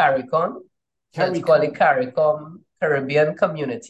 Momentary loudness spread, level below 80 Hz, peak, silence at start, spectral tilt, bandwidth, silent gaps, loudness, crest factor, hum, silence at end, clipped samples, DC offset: 9 LU; -68 dBFS; -4 dBFS; 0 s; -6.5 dB/octave; 8.6 kHz; none; -20 LUFS; 16 dB; none; 0 s; under 0.1%; under 0.1%